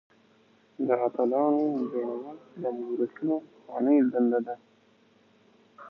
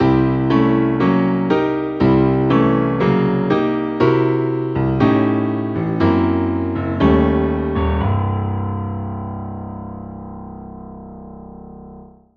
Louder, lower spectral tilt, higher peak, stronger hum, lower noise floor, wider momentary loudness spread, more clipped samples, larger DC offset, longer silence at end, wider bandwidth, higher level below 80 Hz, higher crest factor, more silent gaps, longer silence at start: second, -28 LUFS vs -17 LUFS; about the same, -10 dB/octave vs -9.5 dB/octave; second, -12 dBFS vs -2 dBFS; neither; first, -62 dBFS vs -40 dBFS; second, 15 LU vs 19 LU; neither; neither; second, 0 s vs 0.3 s; second, 5 kHz vs 6.2 kHz; second, -84 dBFS vs -34 dBFS; about the same, 18 dB vs 16 dB; neither; first, 0.8 s vs 0 s